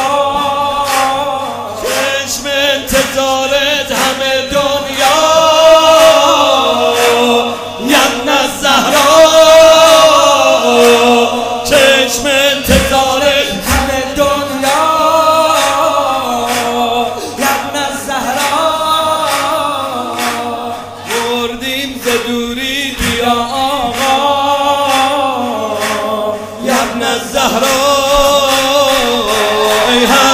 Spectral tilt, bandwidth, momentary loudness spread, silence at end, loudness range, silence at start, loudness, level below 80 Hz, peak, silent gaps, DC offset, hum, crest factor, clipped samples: -2.5 dB/octave; 16.5 kHz; 10 LU; 0 s; 8 LU; 0 s; -10 LUFS; -34 dBFS; 0 dBFS; none; under 0.1%; none; 10 dB; 0.5%